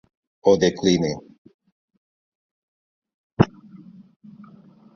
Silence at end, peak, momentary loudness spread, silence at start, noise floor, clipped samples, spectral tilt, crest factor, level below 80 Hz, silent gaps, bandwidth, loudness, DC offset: 1.5 s; -2 dBFS; 14 LU; 0.45 s; -49 dBFS; under 0.1%; -6 dB/octave; 24 dB; -52 dBFS; 1.38-1.45 s, 1.54-1.59 s, 1.72-1.88 s, 1.97-3.02 s, 3.14-3.37 s; 7.2 kHz; -21 LUFS; under 0.1%